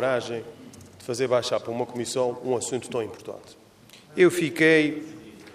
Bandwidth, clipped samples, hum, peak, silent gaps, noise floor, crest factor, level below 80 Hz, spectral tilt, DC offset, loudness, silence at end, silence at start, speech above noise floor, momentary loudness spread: 15.5 kHz; under 0.1%; none; -6 dBFS; none; -51 dBFS; 20 dB; -70 dBFS; -4.5 dB/octave; under 0.1%; -24 LUFS; 0 s; 0 s; 27 dB; 22 LU